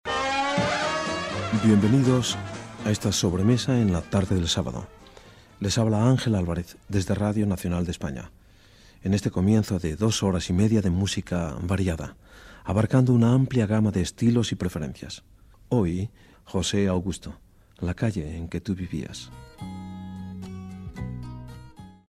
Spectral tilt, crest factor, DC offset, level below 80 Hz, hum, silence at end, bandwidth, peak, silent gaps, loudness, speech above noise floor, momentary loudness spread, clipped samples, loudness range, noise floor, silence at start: -6 dB/octave; 18 dB; under 0.1%; -46 dBFS; none; 0.2 s; 14.5 kHz; -8 dBFS; none; -25 LUFS; 29 dB; 17 LU; under 0.1%; 9 LU; -53 dBFS; 0.05 s